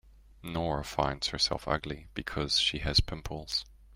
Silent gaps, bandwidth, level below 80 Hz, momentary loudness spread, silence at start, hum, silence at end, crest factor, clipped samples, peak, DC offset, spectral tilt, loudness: none; 16 kHz; -44 dBFS; 12 LU; 0.05 s; none; 0 s; 20 dB; under 0.1%; -12 dBFS; under 0.1%; -3.5 dB/octave; -31 LUFS